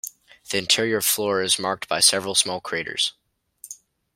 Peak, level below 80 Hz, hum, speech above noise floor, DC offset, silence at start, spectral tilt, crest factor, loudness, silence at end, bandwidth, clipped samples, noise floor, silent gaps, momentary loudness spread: -2 dBFS; -66 dBFS; none; 27 dB; under 0.1%; 0.05 s; -1 dB/octave; 22 dB; -21 LUFS; 0.4 s; 16.5 kHz; under 0.1%; -49 dBFS; none; 22 LU